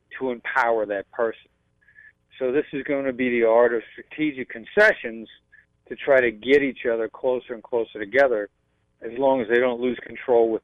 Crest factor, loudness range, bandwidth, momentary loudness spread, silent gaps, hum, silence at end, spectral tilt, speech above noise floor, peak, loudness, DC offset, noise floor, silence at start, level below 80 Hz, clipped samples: 18 dB; 2 LU; 8.4 kHz; 13 LU; none; none; 0.05 s; -6 dB/octave; 33 dB; -6 dBFS; -22 LUFS; under 0.1%; -55 dBFS; 0.1 s; -60 dBFS; under 0.1%